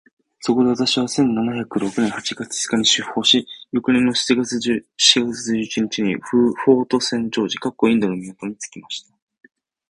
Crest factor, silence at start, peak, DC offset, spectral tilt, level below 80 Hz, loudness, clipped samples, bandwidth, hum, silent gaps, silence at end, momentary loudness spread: 20 dB; 0.4 s; 0 dBFS; under 0.1%; -3.5 dB/octave; -58 dBFS; -19 LUFS; under 0.1%; 11.5 kHz; none; none; 0.9 s; 12 LU